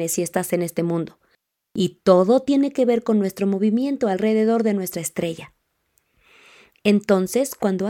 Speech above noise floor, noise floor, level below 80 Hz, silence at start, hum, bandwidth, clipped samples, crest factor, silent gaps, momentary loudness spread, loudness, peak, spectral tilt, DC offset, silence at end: 48 dB; -68 dBFS; -62 dBFS; 0 s; none; 17 kHz; under 0.1%; 20 dB; none; 9 LU; -21 LUFS; -2 dBFS; -5.5 dB/octave; under 0.1%; 0 s